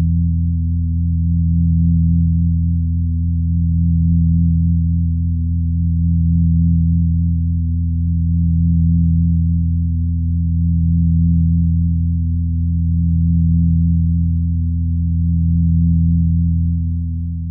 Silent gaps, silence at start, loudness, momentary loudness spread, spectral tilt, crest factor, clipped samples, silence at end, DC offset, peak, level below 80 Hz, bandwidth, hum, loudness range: none; 0 s; -17 LUFS; 4 LU; -30.5 dB/octave; 8 dB; under 0.1%; 0 s; under 0.1%; -6 dBFS; -22 dBFS; 0.3 kHz; none; 1 LU